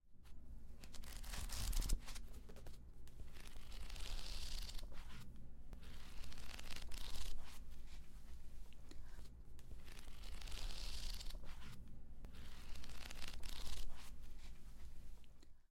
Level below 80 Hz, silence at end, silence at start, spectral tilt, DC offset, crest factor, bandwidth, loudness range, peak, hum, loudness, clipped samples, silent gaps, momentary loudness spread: -50 dBFS; 0.05 s; 0.05 s; -3 dB/octave; under 0.1%; 16 dB; 16 kHz; 5 LU; -28 dBFS; none; -54 LUFS; under 0.1%; none; 12 LU